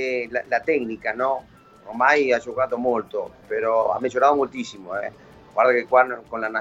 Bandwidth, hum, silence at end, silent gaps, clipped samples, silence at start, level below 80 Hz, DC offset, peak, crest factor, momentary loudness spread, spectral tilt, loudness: 8 kHz; none; 0 s; none; under 0.1%; 0 s; -60 dBFS; under 0.1%; -4 dBFS; 18 dB; 12 LU; -4.5 dB/octave; -22 LUFS